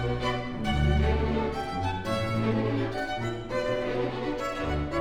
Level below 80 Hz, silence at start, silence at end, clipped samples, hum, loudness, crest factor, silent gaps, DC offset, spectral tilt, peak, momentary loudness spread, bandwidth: -36 dBFS; 0 s; 0 s; under 0.1%; none; -29 LUFS; 14 dB; none; under 0.1%; -7 dB/octave; -14 dBFS; 6 LU; 11.5 kHz